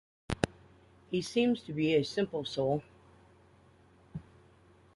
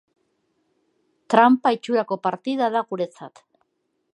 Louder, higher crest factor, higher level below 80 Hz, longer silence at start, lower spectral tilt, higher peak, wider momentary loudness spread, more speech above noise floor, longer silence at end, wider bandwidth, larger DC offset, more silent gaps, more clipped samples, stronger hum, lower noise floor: second, -32 LUFS vs -21 LUFS; about the same, 24 dB vs 22 dB; first, -58 dBFS vs -76 dBFS; second, 0.3 s vs 1.3 s; about the same, -6 dB/octave vs -6 dB/octave; second, -10 dBFS vs 0 dBFS; first, 19 LU vs 13 LU; second, 31 dB vs 53 dB; about the same, 0.75 s vs 0.85 s; first, 11.5 kHz vs 10 kHz; neither; neither; neither; neither; second, -62 dBFS vs -74 dBFS